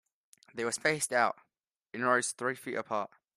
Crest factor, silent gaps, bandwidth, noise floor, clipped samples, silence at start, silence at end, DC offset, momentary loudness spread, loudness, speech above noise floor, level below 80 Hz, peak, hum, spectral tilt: 22 dB; 1.76-1.80 s; 15 kHz; -84 dBFS; under 0.1%; 0.55 s; 0.3 s; under 0.1%; 13 LU; -31 LUFS; 52 dB; -80 dBFS; -12 dBFS; none; -2.5 dB/octave